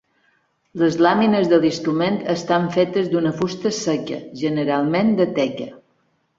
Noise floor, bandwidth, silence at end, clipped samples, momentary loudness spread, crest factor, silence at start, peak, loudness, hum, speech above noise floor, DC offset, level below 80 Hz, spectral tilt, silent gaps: -65 dBFS; 7.8 kHz; 0.6 s; under 0.1%; 9 LU; 18 dB; 0.75 s; -2 dBFS; -19 LUFS; none; 46 dB; under 0.1%; -60 dBFS; -6 dB/octave; none